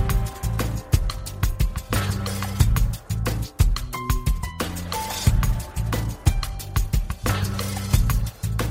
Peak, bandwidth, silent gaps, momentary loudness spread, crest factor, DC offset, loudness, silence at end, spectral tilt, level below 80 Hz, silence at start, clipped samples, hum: -4 dBFS; 16.5 kHz; none; 6 LU; 18 dB; under 0.1%; -25 LUFS; 0 s; -5 dB/octave; -26 dBFS; 0 s; under 0.1%; none